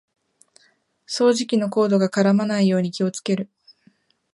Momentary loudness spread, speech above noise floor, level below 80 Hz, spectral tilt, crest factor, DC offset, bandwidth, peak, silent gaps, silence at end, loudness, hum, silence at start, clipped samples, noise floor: 8 LU; 43 dB; -72 dBFS; -6 dB/octave; 16 dB; under 0.1%; 11.5 kHz; -6 dBFS; none; 0.9 s; -20 LUFS; none; 1.1 s; under 0.1%; -62 dBFS